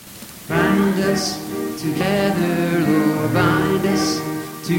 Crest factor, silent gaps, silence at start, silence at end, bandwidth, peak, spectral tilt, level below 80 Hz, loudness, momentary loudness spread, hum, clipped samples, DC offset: 16 dB; none; 0 s; 0 s; 17 kHz; -2 dBFS; -5.5 dB/octave; -46 dBFS; -19 LUFS; 9 LU; none; under 0.1%; under 0.1%